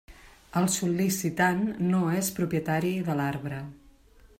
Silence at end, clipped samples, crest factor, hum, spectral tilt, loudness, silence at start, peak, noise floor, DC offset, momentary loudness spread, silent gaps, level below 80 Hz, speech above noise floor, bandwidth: 0.15 s; under 0.1%; 18 dB; none; -5 dB/octave; -27 LUFS; 0.1 s; -10 dBFS; -56 dBFS; under 0.1%; 9 LU; none; -58 dBFS; 29 dB; 16 kHz